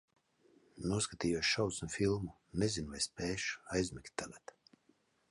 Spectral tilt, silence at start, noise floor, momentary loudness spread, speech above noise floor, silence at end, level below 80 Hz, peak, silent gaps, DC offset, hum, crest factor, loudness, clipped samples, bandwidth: -4 dB/octave; 0.75 s; -74 dBFS; 12 LU; 37 dB; 0.95 s; -58 dBFS; -20 dBFS; none; under 0.1%; none; 18 dB; -37 LUFS; under 0.1%; 11.5 kHz